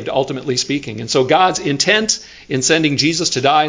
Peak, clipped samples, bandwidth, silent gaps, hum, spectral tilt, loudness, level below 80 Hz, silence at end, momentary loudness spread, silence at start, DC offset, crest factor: 0 dBFS; under 0.1%; 7.8 kHz; none; none; -3 dB/octave; -15 LUFS; -52 dBFS; 0 s; 7 LU; 0 s; under 0.1%; 16 dB